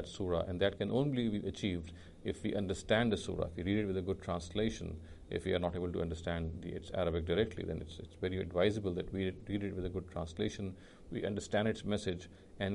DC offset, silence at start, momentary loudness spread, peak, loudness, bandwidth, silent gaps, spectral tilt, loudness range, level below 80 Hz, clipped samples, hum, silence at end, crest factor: under 0.1%; 0 s; 11 LU; -16 dBFS; -37 LUFS; 11.5 kHz; none; -6 dB/octave; 3 LU; -52 dBFS; under 0.1%; none; 0 s; 20 dB